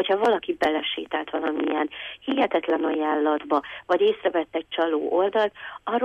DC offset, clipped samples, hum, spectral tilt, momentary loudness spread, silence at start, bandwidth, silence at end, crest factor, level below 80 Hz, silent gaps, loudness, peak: under 0.1%; under 0.1%; none; -5 dB/octave; 6 LU; 0 s; 10 kHz; 0 s; 14 dB; -64 dBFS; none; -24 LUFS; -10 dBFS